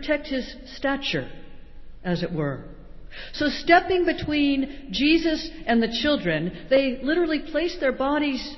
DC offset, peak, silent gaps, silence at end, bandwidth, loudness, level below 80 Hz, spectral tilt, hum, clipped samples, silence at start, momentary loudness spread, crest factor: under 0.1%; -6 dBFS; none; 0 s; 6.2 kHz; -24 LUFS; -44 dBFS; -6 dB/octave; none; under 0.1%; 0 s; 11 LU; 18 dB